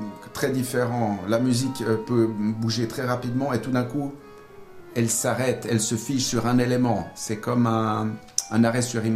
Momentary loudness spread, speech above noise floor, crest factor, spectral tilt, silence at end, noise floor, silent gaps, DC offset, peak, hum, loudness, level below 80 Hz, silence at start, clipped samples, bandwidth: 7 LU; 21 dB; 22 dB; -5 dB/octave; 0 s; -44 dBFS; none; under 0.1%; -2 dBFS; none; -24 LUFS; -56 dBFS; 0 s; under 0.1%; 16 kHz